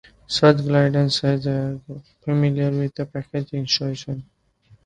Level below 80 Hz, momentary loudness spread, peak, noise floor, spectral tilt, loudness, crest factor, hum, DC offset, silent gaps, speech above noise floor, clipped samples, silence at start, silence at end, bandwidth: -54 dBFS; 16 LU; 0 dBFS; -56 dBFS; -6 dB/octave; -21 LUFS; 20 dB; none; under 0.1%; none; 35 dB; under 0.1%; 0.3 s; 0.6 s; 9.4 kHz